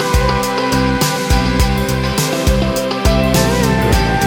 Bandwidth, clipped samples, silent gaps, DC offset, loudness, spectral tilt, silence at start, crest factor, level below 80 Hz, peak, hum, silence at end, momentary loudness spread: over 20 kHz; under 0.1%; none; under 0.1%; -15 LUFS; -5 dB/octave; 0 s; 14 dB; -20 dBFS; 0 dBFS; none; 0 s; 3 LU